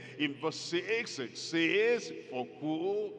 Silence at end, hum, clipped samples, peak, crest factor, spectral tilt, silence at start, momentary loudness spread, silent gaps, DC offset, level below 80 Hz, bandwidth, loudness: 0 s; none; under 0.1%; -16 dBFS; 18 dB; -4 dB/octave; 0 s; 11 LU; none; under 0.1%; under -90 dBFS; 9.8 kHz; -33 LUFS